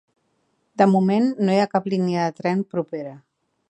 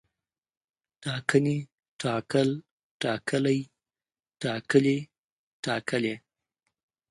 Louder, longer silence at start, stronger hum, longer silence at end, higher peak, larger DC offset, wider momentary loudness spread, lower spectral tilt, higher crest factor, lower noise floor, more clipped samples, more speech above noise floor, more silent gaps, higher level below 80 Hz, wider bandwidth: first, -21 LUFS vs -28 LUFS; second, 0.8 s vs 1 s; neither; second, 0.5 s vs 0.95 s; first, -2 dBFS vs -6 dBFS; neither; about the same, 14 LU vs 14 LU; first, -7.5 dB/octave vs -6 dB/octave; about the same, 20 dB vs 22 dB; second, -69 dBFS vs under -90 dBFS; neither; second, 48 dB vs over 64 dB; second, none vs 1.73-1.78 s, 1.89-1.99 s, 2.71-3.00 s, 5.18-5.63 s; about the same, -72 dBFS vs -70 dBFS; second, 8.6 kHz vs 11.5 kHz